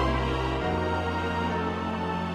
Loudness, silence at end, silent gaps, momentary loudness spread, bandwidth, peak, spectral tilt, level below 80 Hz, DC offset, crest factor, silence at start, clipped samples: -28 LUFS; 0 s; none; 2 LU; 12 kHz; -12 dBFS; -6.5 dB/octave; -38 dBFS; under 0.1%; 14 dB; 0 s; under 0.1%